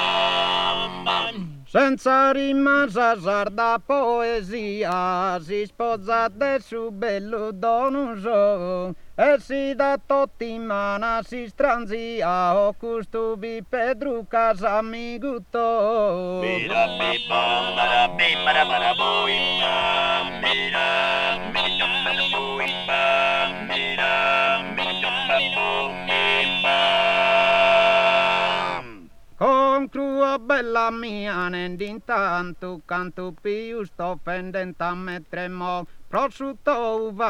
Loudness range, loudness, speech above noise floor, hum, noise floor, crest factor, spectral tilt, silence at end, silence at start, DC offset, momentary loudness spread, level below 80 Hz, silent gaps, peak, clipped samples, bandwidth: 8 LU; -22 LUFS; 20 dB; none; -42 dBFS; 16 dB; -4.5 dB/octave; 0 s; 0 s; under 0.1%; 11 LU; -50 dBFS; none; -6 dBFS; under 0.1%; 11.5 kHz